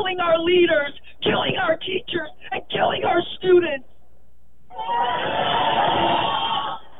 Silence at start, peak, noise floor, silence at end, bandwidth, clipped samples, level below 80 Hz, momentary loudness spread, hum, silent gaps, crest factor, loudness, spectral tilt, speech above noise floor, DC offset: 0 s; -6 dBFS; -57 dBFS; 0.2 s; 4 kHz; under 0.1%; -54 dBFS; 11 LU; none; none; 16 dB; -21 LUFS; -8 dB/octave; 37 dB; 2%